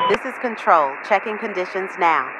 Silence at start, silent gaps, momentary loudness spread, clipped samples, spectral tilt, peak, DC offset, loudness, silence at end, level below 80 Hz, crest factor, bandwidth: 0 s; none; 9 LU; under 0.1%; -4.5 dB/octave; -2 dBFS; under 0.1%; -20 LUFS; 0 s; -62 dBFS; 18 dB; 12 kHz